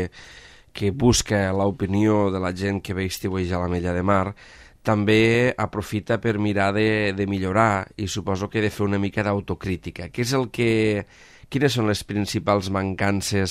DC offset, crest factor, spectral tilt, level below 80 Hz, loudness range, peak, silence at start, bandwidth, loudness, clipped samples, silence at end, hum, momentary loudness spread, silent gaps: under 0.1%; 18 dB; -5.5 dB/octave; -46 dBFS; 3 LU; -4 dBFS; 0 s; 15 kHz; -23 LUFS; under 0.1%; 0 s; none; 9 LU; none